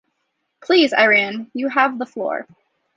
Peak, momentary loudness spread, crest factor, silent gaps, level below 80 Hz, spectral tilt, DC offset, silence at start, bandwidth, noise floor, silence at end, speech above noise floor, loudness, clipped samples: -2 dBFS; 12 LU; 18 dB; none; -72 dBFS; -4 dB/octave; under 0.1%; 0.7 s; 7.6 kHz; -73 dBFS; 0.55 s; 55 dB; -17 LUFS; under 0.1%